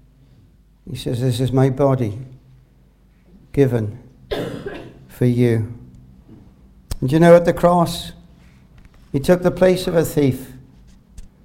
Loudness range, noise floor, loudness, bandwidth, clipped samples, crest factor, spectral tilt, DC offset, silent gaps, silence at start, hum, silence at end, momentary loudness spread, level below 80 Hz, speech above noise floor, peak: 7 LU; -52 dBFS; -18 LUFS; 16.5 kHz; under 0.1%; 20 dB; -7 dB/octave; under 0.1%; none; 0.85 s; none; 0.2 s; 21 LU; -42 dBFS; 36 dB; 0 dBFS